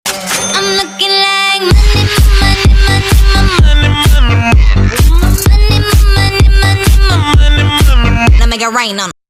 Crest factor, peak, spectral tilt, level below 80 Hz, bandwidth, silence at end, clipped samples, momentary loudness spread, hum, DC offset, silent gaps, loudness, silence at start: 6 dB; 0 dBFS; -4.5 dB/octave; -10 dBFS; 15.5 kHz; 0.2 s; 0.3%; 3 LU; none; under 0.1%; none; -9 LUFS; 0.05 s